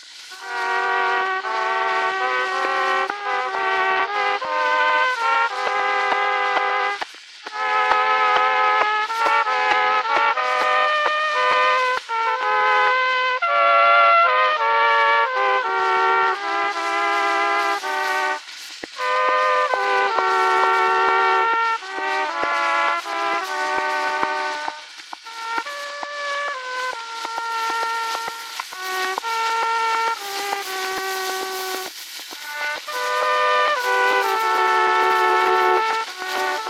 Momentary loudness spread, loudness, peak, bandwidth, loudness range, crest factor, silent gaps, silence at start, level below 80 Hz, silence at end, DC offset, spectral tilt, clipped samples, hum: 10 LU; -19 LUFS; 0 dBFS; 17 kHz; 8 LU; 20 dB; none; 0 s; -70 dBFS; 0 s; under 0.1%; -0.5 dB/octave; under 0.1%; none